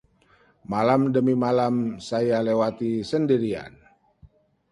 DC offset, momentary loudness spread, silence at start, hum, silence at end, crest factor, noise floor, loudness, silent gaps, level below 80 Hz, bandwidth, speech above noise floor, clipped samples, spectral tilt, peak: under 0.1%; 9 LU; 0.7 s; none; 0.45 s; 18 dB; -60 dBFS; -23 LUFS; none; -60 dBFS; 11 kHz; 37 dB; under 0.1%; -7.5 dB/octave; -6 dBFS